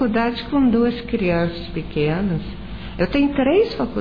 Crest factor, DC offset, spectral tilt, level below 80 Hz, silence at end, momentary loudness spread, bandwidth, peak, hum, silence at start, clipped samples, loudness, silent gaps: 14 dB; 1%; -9 dB/octave; -36 dBFS; 0 s; 11 LU; 5.2 kHz; -6 dBFS; none; 0 s; under 0.1%; -20 LUFS; none